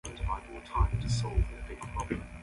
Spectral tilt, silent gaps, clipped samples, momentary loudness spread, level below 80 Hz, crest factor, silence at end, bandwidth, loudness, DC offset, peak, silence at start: -5.5 dB/octave; none; under 0.1%; 8 LU; -36 dBFS; 18 dB; 0 s; 11.5 kHz; -34 LUFS; under 0.1%; -14 dBFS; 0.05 s